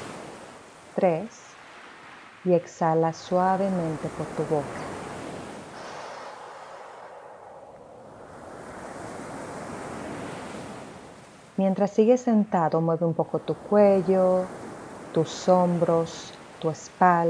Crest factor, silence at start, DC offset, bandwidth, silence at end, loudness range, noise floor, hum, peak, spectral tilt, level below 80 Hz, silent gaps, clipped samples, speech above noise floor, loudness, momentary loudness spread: 22 dB; 0 s; under 0.1%; 10.5 kHz; 0 s; 18 LU; -48 dBFS; none; -6 dBFS; -7 dB/octave; -62 dBFS; none; under 0.1%; 25 dB; -25 LUFS; 24 LU